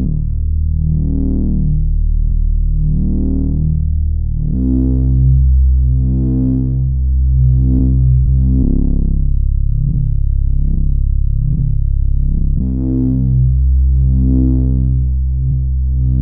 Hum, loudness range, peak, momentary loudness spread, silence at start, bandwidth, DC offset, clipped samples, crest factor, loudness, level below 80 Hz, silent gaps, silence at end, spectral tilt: none; 3 LU; -2 dBFS; 5 LU; 0 s; 1 kHz; 4%; under 0.1%; 8 dB; -15 LUFS; -14 dBFS; none; 0 s; -18 dB/octave